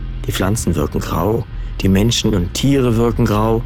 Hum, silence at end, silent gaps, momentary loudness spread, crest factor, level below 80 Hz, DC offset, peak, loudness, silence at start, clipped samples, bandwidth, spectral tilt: none; 0 s; none; 6 LU; 10 dB; -26 dBFS; under 0.1%; -6 dBFS; -17 LUFS; 0 s; under 0.1%; 18 kHz; -5.5 dB/octave